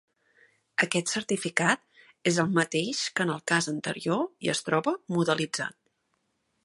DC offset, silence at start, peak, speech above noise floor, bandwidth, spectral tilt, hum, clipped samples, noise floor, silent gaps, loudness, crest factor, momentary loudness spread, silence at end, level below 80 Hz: under 0.1%; 0.8 s; -4 dBFS; 48 dB; 11.5 kHz; -4 dB/octave; none; under 0.1%; -76 dBFS; none; -28 LUFS; 24 dB; 6 LU; 0.95 s; -72 dBFS